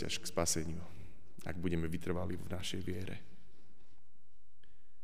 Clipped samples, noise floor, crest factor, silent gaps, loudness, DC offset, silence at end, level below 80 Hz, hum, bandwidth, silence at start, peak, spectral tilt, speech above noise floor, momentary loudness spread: under 0.1%; -73 dBFS; 22 dB; none; -39 LUFS; 1%; 1.7 s; -58 dBFS; none; 15.5 kHz; 0 s; -20 dBFS; -4 dB/octave; 34 dB; 17 LU